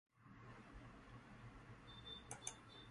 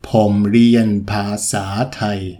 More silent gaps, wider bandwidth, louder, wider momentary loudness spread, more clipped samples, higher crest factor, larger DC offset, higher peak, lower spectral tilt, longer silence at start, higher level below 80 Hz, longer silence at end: neither; second, 11 kHz vs 14.5 kHz; second, -57 LUFS vs -16 LUFS; about the same, 9 LU vs 9 LU; neither; first, 30 dB vs 14 dB; neither; second, -28 dBFS vs -2 dBFS; second, -3 dB/octave vs -5.5 dB/octave; about the same, 0.15 s vs 0.05 s; second, -68 dBFS vs -46 dBFS; about the same, 0 s vs 0 s